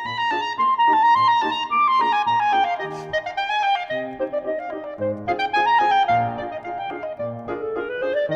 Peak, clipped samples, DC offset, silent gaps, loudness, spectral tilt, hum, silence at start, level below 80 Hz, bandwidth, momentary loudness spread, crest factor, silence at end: -8 dBFS; under 0.1%; under 0.1%; none; -21 LUFS; -5 dB/octave; none; 0 s; -60 dBFS; 8 kHz; 12 LU; 12 dB; 0 s